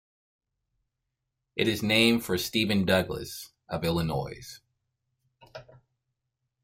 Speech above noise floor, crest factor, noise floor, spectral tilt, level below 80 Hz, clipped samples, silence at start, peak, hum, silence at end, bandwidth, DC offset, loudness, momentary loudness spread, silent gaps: 57 dB; 22 dB; -84 dBFS; -4.5 dB/octave; -56 dBFS; under 0.1%; 1.55 s; -8 dBFS; none; 1 s; 16 kHz; under 0.1%; -27 LUFS; 21 LU; none